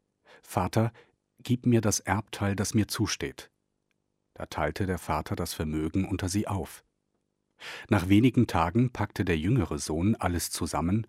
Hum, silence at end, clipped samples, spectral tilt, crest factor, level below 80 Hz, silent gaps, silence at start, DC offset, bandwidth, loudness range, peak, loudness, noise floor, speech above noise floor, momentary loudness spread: none; 0.05 s; under 0.1%; -5.5 dB/octave; 20 dB; -48 dBFS; none; 0.5 s; under 0.1%; 16 kHz; 6 LU; -10 dBFS; -28 LUFS; -78 dBFS; 51 dB; 11 LU